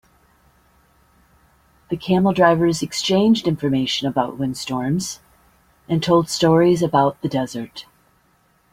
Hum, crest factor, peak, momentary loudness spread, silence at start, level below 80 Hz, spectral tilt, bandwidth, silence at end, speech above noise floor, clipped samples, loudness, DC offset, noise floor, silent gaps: none; 18 dB; -2 dBFS; 14 LU; 1.9 s; -52 dBFS; -5.5 dB/octave; 16 kHz; 0.9 s; 42 dB; under 0.1%; -19 LUFS; under 0.1%; -60 dBFS; none